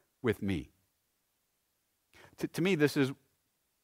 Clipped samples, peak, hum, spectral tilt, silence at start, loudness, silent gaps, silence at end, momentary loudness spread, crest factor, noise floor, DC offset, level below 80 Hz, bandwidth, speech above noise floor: under 0.1%; -14 dBFS; none; -6 dB/octave; 0.25 s; -33 LUFS; none; 0.7 s; 12 LU; 22 dB; -79 dBFS; under 0.1%; -64 dBFS; 16 kHz; 48 dB